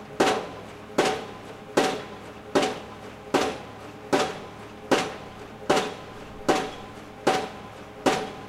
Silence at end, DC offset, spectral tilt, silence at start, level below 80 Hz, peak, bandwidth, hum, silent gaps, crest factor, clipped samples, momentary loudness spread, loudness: 0 s; under 0.1%; -3.5 dB/octave; 0 s; -56 dBFS; -6 dBFS; 16 kHz; none; none; 22 dB; under 0.1%; 16 LU; -27 LUFS